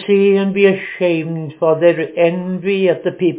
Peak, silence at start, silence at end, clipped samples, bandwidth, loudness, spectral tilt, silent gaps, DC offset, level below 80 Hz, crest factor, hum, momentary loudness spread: 0 dBFS; 0 s; 0 s; under 0.1%; 4 kHz; -15 LUFS; -11 dB/octave; none; under 0.1%; -66 dBFS; 14 dB; none; 6 LU